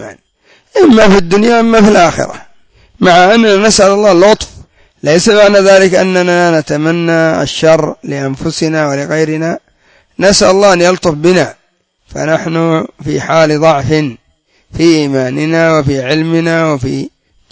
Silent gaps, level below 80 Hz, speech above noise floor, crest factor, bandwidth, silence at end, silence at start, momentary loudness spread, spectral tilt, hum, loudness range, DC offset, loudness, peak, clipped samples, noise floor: none; -38 dBFS; 48 dB; 10 dB; 8 kHz; 0.45 s; 0 s; 12 LU; -5 dB/octave; none; 5 LU; under 0.1%; -9 LUFS; 0 dBFS; 1%; -56 dBFS